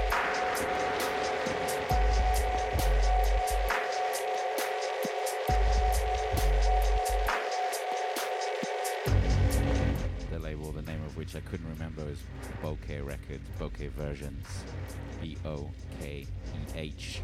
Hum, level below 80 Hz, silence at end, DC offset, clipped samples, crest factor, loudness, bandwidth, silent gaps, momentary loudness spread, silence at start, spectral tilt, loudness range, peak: none; -34 dBFS; 0 s; under 0.1%; under 0.1%; 14 dB; -32 LUFS; 16 kHz; none; 12 LU; 0 s; -4.5 dB/octave; 10 LU; -16 dBFS